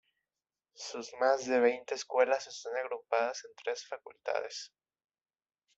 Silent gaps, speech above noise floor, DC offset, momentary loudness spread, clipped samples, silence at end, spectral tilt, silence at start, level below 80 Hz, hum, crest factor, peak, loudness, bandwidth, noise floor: none; over 57 dB; under 0.1%; 14 LU; under 0.1%; 1.1 s; -2 dB/octave; 0.8 s; -84 dBFS; none; 22 dB; -14 dBFS; -33 LUFS; 8 kHz; under -90 dBFS